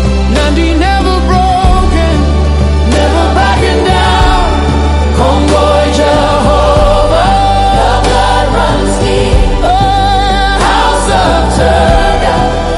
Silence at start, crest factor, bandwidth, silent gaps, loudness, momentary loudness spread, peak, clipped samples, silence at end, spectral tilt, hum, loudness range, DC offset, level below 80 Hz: 0 s; 8 dB; 11.5 kHz; none; -9 LUFS; 2 LU; 0 dBFS; 1%; 0 s; -5.5 dB/octave; none; 1 LU; under 0.1%; -12 dBFS